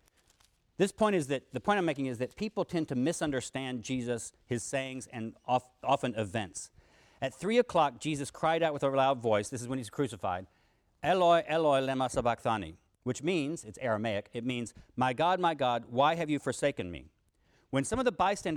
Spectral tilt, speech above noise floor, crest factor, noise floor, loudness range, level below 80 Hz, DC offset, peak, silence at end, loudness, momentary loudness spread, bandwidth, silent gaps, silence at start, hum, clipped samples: -5 dB/octave; 38 dB; 18 dB; -69 dBFS; 4 LU; -62 dBFS; under 0.1%; -14 dBFS; 0 s; -32 LUFS; 11 LU; 14.5 kHz; none; 0.8 s; none; under 0.1%